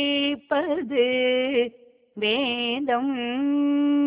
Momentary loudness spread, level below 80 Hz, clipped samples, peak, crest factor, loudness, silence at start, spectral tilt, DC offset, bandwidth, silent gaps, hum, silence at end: 4 LU; -66 dBFS; under 0.1%; -10 dBFS; 14 dB; -24 LUFS; 0 s; -8 dB/octave; under 0.1%; 4 kHz; none; none; 0 s